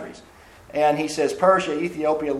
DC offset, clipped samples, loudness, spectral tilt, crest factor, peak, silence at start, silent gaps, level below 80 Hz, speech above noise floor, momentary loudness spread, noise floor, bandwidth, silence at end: under 0.1%; under 0.1%; -21 LUFS; -5 dB/octave; 18 dB; -4 dBFS; 0 s; none; -56 dBFS; 27 dB; 10 LU; -48 dBFS; 13 kHz; 0 s